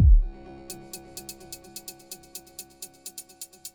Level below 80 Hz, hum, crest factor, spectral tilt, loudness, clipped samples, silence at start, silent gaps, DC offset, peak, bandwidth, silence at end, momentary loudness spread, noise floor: -28 dBFS; none; 18 dB; -5 dB/octave; -34 LUFS; under 0.1%; 0 s; none; under 0.1%; -8 dBFS; over 20 kHz; 0.05 s; 8 LU; -45 dBFS